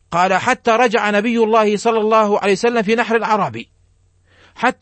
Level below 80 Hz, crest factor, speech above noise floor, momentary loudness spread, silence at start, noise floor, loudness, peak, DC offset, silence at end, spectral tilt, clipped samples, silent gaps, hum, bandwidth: -58 dBFS; 14 dB; 40 dB; 5 LU; 0.1 s; -55 dBFS; -15 LUFS; -2 dBFS; under 0.1%; 0.1 s; -4.5 dB/octave; under 0.1%; none; none; 8.8 kHz